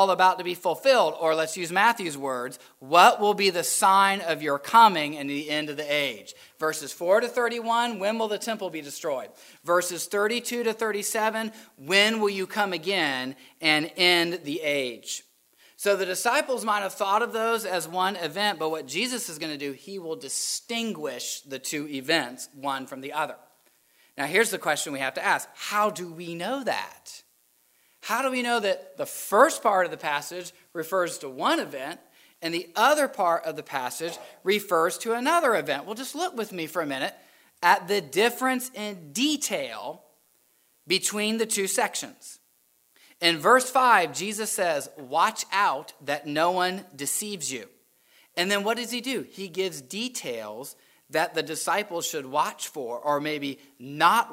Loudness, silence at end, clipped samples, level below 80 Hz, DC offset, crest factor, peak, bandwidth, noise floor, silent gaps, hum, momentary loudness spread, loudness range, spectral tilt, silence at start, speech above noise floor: -25 LUFS; 0 s; under 0.1%; -82 dBFS; under 0.1%; 22 dB; -4 dBFS; 16 kHz; -66 dBFS; none; none; 14 LU; 7 LU; -2 dB/octave; 0 s; 40 dB